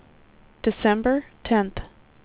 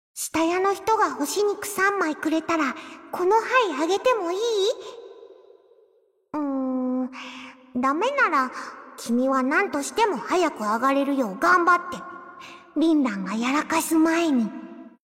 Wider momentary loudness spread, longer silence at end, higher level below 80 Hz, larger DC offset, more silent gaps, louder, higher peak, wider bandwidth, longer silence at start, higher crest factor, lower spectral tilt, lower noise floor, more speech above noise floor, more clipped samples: second, 9 LU vs 16 LU; first, 0.4 s vs 0.15 s; first, -44 dBFS vs -66 dBFS; neither; neither; about the same, -24 LUFS vs -23 LUFS; about the same, -8 dBFS vs -8 dBFS; second, 4 kHz vs 16.5 kHz; first, 0.65 s vs 0.15 s; about the same, 18 dB vs 16 dB; first, -10 dB/octave vs -3.5 dB/octave; second, -53 dBFS vs -63 dBFS; second, 31 dB vs 40 dB; neither